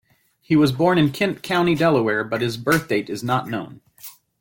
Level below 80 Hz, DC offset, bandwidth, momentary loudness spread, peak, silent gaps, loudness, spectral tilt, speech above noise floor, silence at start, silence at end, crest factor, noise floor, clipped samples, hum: -54 dBFS; under 0.1%; 17 kHz; 22 LU; -6 dBFS; none; -20 LUFS; -6 dB/octave; 24 dB; 0.5 s; 0.3 s; 16 dB; -44 dBFS; under 0.1%; none